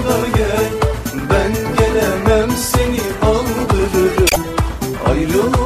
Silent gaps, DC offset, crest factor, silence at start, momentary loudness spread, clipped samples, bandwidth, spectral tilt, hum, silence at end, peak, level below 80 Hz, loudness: none; under 0.1%; 14 dB; 0 s; 5 LU; under 0.1%; 15.5 kHz; -5 dB/octave; none; 0 s; -2 dBFS; -24 dBFS; -16 LUFS